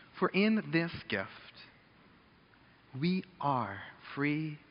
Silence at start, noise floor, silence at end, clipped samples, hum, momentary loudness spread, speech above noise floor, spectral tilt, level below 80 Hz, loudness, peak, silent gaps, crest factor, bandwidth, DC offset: 0 s; -62 dBFS; 0.15 s; under 0.1%; none; 19 LU; 30 dB; -5 dB/octave; -72 dBFS; -34 LUFS; -16 dBFS; none; 20 dB; 5.4 kHz; under 0.1%